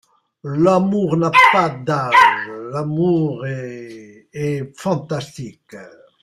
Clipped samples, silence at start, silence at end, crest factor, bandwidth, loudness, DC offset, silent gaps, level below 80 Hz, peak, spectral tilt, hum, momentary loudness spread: under 0.1%; 0.45 s; 0.35 s; 18 dB; 15 kHz; -17 LUFS; under 0.1%; none; -56 dBFS; 0 dBFS; -6 dB/octave; none; 22 LU